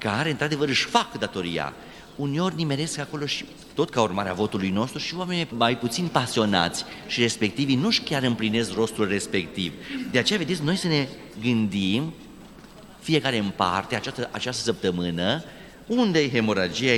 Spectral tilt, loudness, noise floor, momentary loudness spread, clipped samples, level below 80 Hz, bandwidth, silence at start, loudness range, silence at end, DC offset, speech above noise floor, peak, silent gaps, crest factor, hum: -4.5 dB/octave; -25 LUFS; -46 dBFS; 8 LU; under 0.1%; -56 dBFS; 18 kHz; 0 s; 3 LU; 0 s; under 0.1%; 21 dB; -4 dBFS; none; 22 dB; none